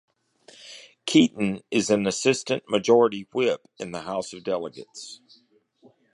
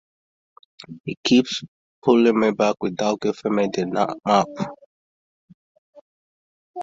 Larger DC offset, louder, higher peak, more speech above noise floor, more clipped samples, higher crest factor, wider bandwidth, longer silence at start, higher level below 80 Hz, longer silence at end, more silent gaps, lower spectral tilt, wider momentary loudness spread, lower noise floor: neither; second, -24 LUFS vs -21 LUFS; about the same, -4 dBFS vs -4 dBFS; second, 38 dB vs over 70 dB; neither; about the same, 20 dB vs 20 dB; first, 11 kHz vs 7.8 kHz; second, 0.65 s vs 0.9 s; about the same, -66 dBFS vs -64 dBFS; first, 1 s vs 0 s; second, none vs 1.00-1.04 s, 1.17-1.23 s, 1.68-2.02 s, 4.86-5.48 s, 5.54-5.93 s, 6.01-6.74 s; about the same, -4.5 dB/octave vs -5 dB/octave; first, 20 LU vs 15 LU; second, -62 dBFS vs under -90 dBFS